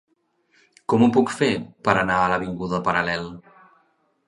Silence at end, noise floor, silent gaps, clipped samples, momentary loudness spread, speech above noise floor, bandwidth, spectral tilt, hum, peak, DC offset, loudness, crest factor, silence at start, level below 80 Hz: 0.85 s; -66 dBFS; none; under 0.1%; 9 LU; 45 dB; 11.5 kHz; -6 dB/octave; none; 0 dBFS; under 0.1%; -21 LUFS; 22 dB; 0.9 s; -52 dBFS